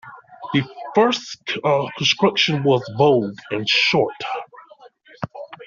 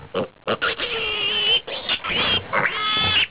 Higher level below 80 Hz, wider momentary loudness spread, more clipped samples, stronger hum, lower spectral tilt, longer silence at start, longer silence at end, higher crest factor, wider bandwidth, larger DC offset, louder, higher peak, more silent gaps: second, -62 dBFS vs -48 dBFS; first, 15 LU vs 7 LU; neither; neither; second, -3 dB/octave vs -6.5 dB/octave; about the same, 0.05 s vs 0 s; about the same, 0 s vs 0 s; about the same, 18 dB vs 14 dB; first, 7.4 kHz vs 4 kHz; second, under 0.1% vs 0.3%; about the same, -19 LUFS vs -20 LUFS; first, -2 dBFS vs -8 dBFS; neither